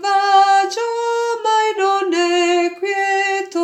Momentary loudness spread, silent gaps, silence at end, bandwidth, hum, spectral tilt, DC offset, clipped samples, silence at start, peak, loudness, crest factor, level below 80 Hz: 7 LU; none; 0 s; 12 kHz; none; 0 dB/octave; under 0.1%; under 0.1%; 0 s; -4 dBFS; -16 LUFS; 14 dB; -82 dBFS